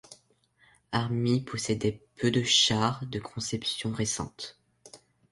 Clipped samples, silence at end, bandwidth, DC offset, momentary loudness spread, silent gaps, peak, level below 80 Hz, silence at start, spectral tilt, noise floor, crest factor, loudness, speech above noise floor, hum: under 0.1%; 0.35 s; 11.5 kHz; under 0.1%; 14 LU; none; -10 dBFS; -58 dBFS; 0.1 s; -4 dB/octave; -66 dBFS; 20 dB; -28 LUFS; 37 dB; none